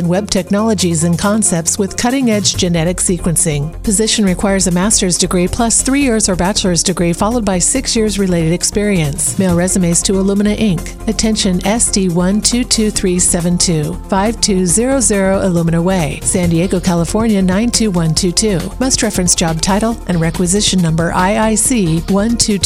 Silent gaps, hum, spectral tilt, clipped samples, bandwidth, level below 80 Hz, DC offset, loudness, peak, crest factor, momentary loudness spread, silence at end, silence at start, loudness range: none; none; -4 dB/octave; under 0.1%; 19 kHz; -28 dBFS; under 0.1%; -13 LUFS; 0 dBFS; 14 dB; 3 LU; 0 s; 0 s; 1 LU